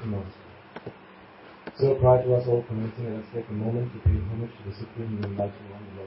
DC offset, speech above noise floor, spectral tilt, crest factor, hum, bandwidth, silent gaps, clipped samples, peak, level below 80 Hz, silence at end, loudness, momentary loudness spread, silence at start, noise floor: under 0.1%; 23 dB; -12.5 dB/octave; 20 dB; none; 5.8 kHz; none; under 0.1%; -8 dBFS; -40 dBFS; 0 s; -27 LUFS; 22 LU; 0 s; -49 dBFS